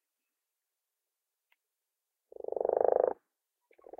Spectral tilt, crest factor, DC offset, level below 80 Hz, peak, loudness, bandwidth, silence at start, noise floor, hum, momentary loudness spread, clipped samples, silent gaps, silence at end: -8.5 dB/octave; 26 dB; under 0.1%; -82 dBFS; -12 dBFS; -31 LUFS; 2.8 kHz; 2.5 s; -88 dBFS; none; 18 LU; under 0.1%; none; 0.85 s